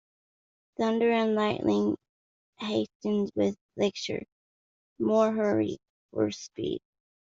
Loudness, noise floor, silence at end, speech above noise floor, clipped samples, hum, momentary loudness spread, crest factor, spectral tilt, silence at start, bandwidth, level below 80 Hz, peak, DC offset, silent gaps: -29 LUFS; under -90 dBFS; 0.5 s; over 63 dB; under 0.1%; none; 13 LU; 18 dB; -6 dB/octave; 0.8 s; 7.6 kHz; -68 dBFS; -12 dBFS; under 0.1%; 2.09-2.53 s, 2.95-3.00 s, 3.61-3.69 s, 4.32-4.96 s, 5.89-6.09 s